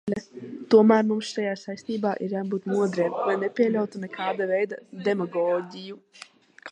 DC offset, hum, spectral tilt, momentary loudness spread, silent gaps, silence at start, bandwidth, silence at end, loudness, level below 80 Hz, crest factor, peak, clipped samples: under 0.1%; none; -6.5 dB/octave; 19 LU; none; 0.05 s; 9.8 kHz; 0 s; -25 LUFS; -72 dBFS; 20 dB; -6 dBFS; under 0.1%